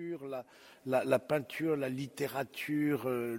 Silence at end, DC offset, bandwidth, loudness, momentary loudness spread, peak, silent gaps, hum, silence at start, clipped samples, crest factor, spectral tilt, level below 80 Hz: 0 s; under 0.1%; 16.5 kHz; -34 LUFS; 12 LU; -14 dBFS; none; none; 0 s; under 0.1%; 20 dB; -6 dB/octave; -76 dBFS